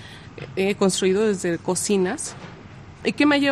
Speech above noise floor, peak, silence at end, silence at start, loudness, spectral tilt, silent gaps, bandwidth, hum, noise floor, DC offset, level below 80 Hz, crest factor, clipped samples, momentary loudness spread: 21 dB; -6 dBFS; 0 s; 0 s; -22 LUFS; -4 dB/octave; none; 14 kHz; none; -42 dBFS; under 0.1%; -56 dBFS; 16 dB; under 0.1%; 21 LU